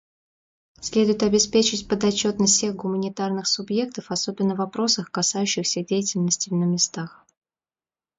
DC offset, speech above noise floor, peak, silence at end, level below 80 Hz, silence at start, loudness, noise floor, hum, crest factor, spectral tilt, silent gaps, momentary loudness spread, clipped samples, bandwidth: under 0.1%; over 67 dB; -6 dBFS; 1.05 s; -58 dBFS; 0.8 s; -22 LUFS; under -90 dBFS; none; 18 dB; -3.5 dB/octave; none; 8 LU; under 0.1%; 8 kHz